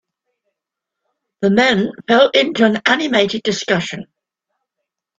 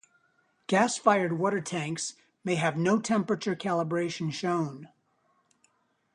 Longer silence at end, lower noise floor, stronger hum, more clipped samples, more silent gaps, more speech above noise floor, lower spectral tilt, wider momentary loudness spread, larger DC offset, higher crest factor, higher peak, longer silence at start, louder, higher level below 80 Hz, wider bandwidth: about the same, 1.15 s vs 1.25 s; first, -82 dBFS vs -71 dBFS; neither; neither; neither; first, 67 dB vs 43 dB; about the same, -4.5 dB/octave vs -5 dB/octave; second, 8 LU vs 11 LU; neither; about the same, 18 dB vs 22 dB; first, 0 dBFS vs -6 dBFS; first, 1.4 s vs 0.7 s; first, -15 LUFS vs -28 LUFS; first, -58 dBFS vs -74 dBFS; second, 7.8 kHz vs 11 kHz